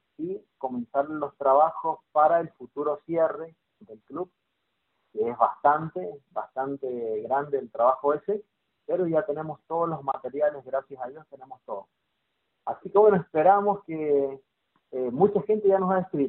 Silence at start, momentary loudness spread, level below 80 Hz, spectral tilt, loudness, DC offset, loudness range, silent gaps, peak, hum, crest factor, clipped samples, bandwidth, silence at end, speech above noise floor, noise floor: 0.2 s; 18 LU; -70 dBFS; -7.5 dB/octave; -26 LUFS; under 0.1%; 6 LU; none; -6 dBFS; none; 20 dB; under 0.1%; 4 kHz; 0 s; 52 dB; -78 dBFS